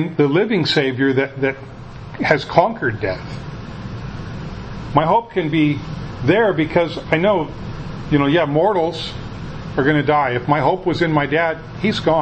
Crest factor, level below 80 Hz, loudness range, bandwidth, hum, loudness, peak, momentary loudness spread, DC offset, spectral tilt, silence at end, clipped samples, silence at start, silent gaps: 18 dB; -40 dBFS; 4 LU; 8.6 kHz; none; -18 LUFS; 0 dBFS; 15 LU; under 0.1%; -7 dB/octave; 0 s; under 0.1%; 0 s; none